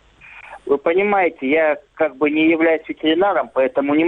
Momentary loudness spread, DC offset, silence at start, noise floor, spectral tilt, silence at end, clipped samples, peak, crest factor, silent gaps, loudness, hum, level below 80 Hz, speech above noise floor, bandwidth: 6 LU; under 0.1%; 0.35 s; -42 dBFS; -7.5 dB/octave; 0 s; under 0.1%; -4 dBFS; 14 dB; none; -18 LUFS; none; -58 dBFS; 25 dB; 4 kHz